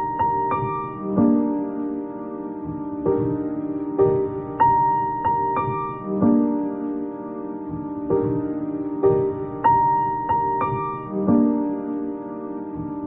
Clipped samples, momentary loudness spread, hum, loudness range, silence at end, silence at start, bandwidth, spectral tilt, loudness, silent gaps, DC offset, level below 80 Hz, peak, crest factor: under 0.1%; 12 LU; none; 3 LU; 0 s; 0 s; 3.8 kHz; -9 dB/octave; -23 LUFS; none; under 0.1%; -50 dBFS; -6 dBFS; 16 dB